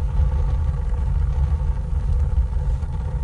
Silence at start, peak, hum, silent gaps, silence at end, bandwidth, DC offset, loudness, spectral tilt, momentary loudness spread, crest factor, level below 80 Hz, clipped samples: 0 s; -8 dBFS; none; none; 0 s; 4.5 kHz; under 0.1%; -24 LUFS; -9 dB/octave; 3 LU; 12 dB; -22 dBFS; under 0.1%